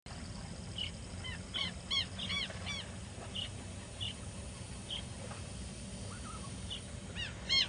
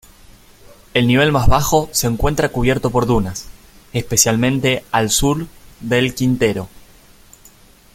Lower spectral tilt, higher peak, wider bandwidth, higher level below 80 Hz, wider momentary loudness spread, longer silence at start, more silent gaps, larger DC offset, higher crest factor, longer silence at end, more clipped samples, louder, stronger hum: about the same, -3 dB/octave vs -4 dB/octave; second, -18 dBFS vs 0 dBFS; second, 11 kHz vs 16.5 kHz; second, -52 dBFS vs -30 dBFS; about the same, 11 LU vs 12 LU; second, 0.05 s vs 0.95 s; neither; neither; about the same, 22 dB vs 18 dB; second, 0 s vs 1.15 s; neither; second, -40 LUFS vs -17 LUFS; neither